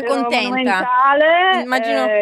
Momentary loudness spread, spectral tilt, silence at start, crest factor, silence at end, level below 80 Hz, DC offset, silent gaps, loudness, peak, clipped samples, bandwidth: 5 LU; -3.5 dB/octave; 0 s; 12 dB; 0 s; -68 dBFS; under 0.1%; none; -15 LUFS; -2 dBFS; under 0.1%; 13.5 kHz